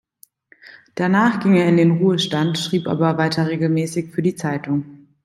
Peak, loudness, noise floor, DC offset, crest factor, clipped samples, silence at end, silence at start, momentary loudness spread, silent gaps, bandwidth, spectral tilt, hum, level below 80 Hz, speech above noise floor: -4 dBFS; -19 LUFS; -53 dBFS; under 0.1%; 16 dB; under 0.1%; 0.3 s; 0.65 s; 9 LU; none; 12.5 kHz; -6.5 dB/octave; none; -62 dBFS; 35 dB